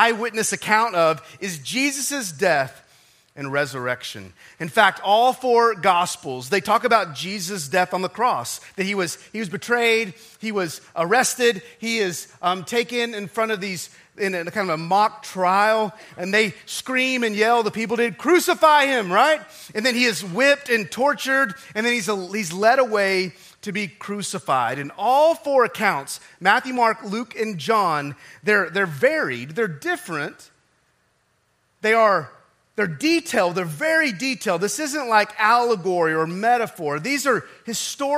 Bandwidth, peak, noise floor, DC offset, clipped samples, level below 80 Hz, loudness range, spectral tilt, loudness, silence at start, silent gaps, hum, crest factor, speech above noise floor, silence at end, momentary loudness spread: 16 kHz; -2 dBFS; -66 dBFS; under 0.1%; under 0.1%; -72 dBFS; 5 LU; -3.5 dB/octave; -21 LUFS; 0 s; none; none; 20 dB; 45 dB; 0 s; 11 LU